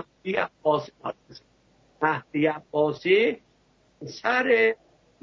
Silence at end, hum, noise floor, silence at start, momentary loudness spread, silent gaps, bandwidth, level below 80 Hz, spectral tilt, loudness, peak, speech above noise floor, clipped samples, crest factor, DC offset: 0.5 s; none; -63 dBFS; 0 s; 17 LU; none; 6.4 kHz; -68 dBFS; -6 dB/octave; -24 LUFS; -8 dBFS; 39 dB; under 0.1%; 18 dB; under 0.1%